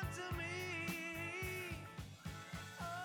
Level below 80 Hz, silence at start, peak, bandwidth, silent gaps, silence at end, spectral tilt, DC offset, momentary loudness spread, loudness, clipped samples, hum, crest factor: -58 dBFS; 0 s; -30 dBFS; 19.5 kHz; none; 0 s; -4.5 dB/octave; under 0.1%; 9 LU; -45 LUFS; under 0.1%; none; 16 dB